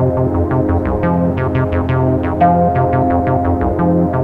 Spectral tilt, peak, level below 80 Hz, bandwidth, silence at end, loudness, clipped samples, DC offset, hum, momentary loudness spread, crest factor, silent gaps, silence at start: -11 dB/octave; -2 dBFS; -28 dBFS; 4.2 kHz; 0 s; -15 LUFS; under 0.1%; under 0.1%; none; 3 LU; 12 dB; none; 0 s